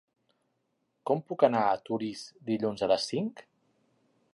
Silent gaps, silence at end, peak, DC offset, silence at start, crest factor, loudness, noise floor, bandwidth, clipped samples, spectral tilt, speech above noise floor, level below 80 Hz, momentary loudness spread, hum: none; 0.95 s; -8 dBFS; under 0.1%; 1.05 s; 24 dB; -30 LUFS; -78 dBFS; 11.5 kHz; under 0.1%; -5.5 dB/octave; 49 dB; -72 dBFS; 13 LU; none